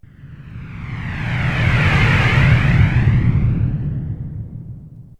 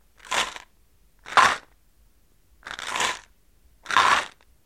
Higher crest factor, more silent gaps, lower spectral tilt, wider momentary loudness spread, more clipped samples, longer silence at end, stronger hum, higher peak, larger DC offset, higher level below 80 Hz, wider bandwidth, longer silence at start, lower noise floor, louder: second, 14 dB vs 26 dB; neither; first, -7 dB/octave vs 0 dB/octave; about the same, 20 LU vs 20 LU; neither; second, 0.15 s vs 0.35 s; neither; about the same, -2 dBFS vs -2 dBFS; first, 0.1% vs under 0.1%; first, -26 dBFS vs -58 dBFS; second, 8.8 kHz vs 16 kHz; about the same, 0.2 s vs 0.25 s; second, -37 dBFS vs -61 dBFS; first, -16 LUFS vs -23 LUFS